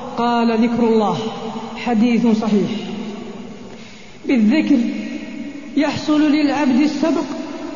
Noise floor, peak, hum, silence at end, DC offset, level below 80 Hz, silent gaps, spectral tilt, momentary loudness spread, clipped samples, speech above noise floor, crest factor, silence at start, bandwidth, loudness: -38 dBFS; -4 dBFS; none; 0 s; 0.8%; -52 dBFS; none; -6 dB/octave; 16 LU; under 0.1%; 22 dB; 14 dB; 0 s; 7.4 kHz; -18 LUFS